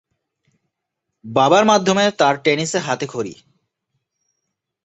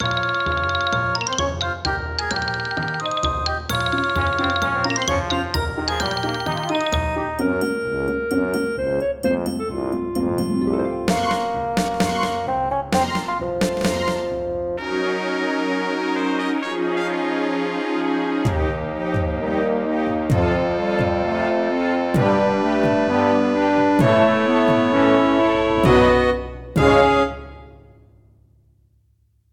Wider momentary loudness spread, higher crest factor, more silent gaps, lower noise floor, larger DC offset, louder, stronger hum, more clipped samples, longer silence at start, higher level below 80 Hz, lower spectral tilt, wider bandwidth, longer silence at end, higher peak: first, 12 LU vs 8 LU; about the same, 18 dB vs 18 dB; neither; first, -79 dBFS vs -61 dBFS; neither; first, -17 LUFS vs -20 LUFS; neither; neither; first, 1.25 s vs 0 s; second, -62 dBFS vs -36 dBFS; second, -4 dB/octave vs -5.5 dB/octave; second, 8.2 kHz vs 18 kHz; second, 1.5 s vs 1.8 s; about the same, -2 dBFS vs -2 dBFS